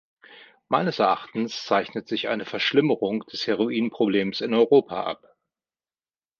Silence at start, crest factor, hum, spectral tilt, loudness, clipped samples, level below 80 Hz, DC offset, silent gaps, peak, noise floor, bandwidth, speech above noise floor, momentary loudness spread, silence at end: 0.3 s; 20 dB; none; -6 dB/octave; -24 LUFS; under 0.1%; -68 dBFS; under 0.1%; none; -6 dBFS; under -90 dBFS; 7 kHz; over 67 dB; 9 LU; 1.25 s